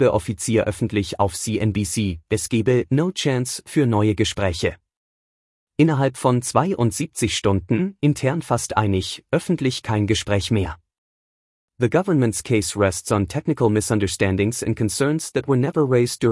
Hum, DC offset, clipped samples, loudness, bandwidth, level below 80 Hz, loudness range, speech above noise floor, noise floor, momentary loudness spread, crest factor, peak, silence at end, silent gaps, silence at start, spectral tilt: none; under 0.1%; under 0.1%; -21 LUFS; 12 kHz; -48 dBFS; 2 LU; over 70 dB; under -90 dBFS; 5 LU; 18 dB; -4 dBFS; 0 s; 4.97-5.67 s, 10.98-11.68 s; 0 s; -5.5 dB/octave